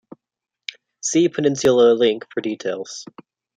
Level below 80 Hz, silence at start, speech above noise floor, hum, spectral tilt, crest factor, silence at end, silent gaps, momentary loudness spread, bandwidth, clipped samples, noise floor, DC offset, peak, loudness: -64 dBFS; 1.05 s; 67 dB; none; -4 dB/octave; 16 dB; 0.55 s; none; 20 LU; 9.6 kHz; under 0.1%; -85 dBFS; under 0.1%; -4 dBFS; -19 LUFS